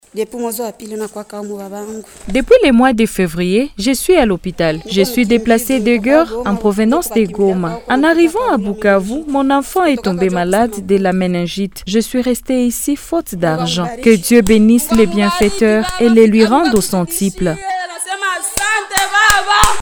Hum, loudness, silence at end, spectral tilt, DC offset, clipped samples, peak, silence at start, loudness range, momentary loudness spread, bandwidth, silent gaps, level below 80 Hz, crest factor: none; -13 LUFS; 0 s; -4.5 dB/octave; under 0.1%; under 0.1%; 0 dBFS; 0.15 s; 4 LU; 11 LU; over 20 kHz; none; -34 dBFS; 14 dB